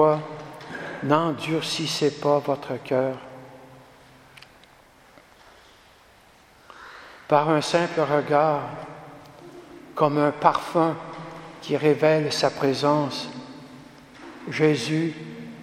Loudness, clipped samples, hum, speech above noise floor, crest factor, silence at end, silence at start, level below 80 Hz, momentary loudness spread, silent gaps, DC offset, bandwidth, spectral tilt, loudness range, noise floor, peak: -23 LUFS; under 0.1%; none; 31 dB; 24 dB; 0 s; 0 s; -66 dBFS; 23 LU; none; under 0.1%; 14.5 kHz; -5.5 dB/octave; 6 LU; -54 dBFS; -2 dBFS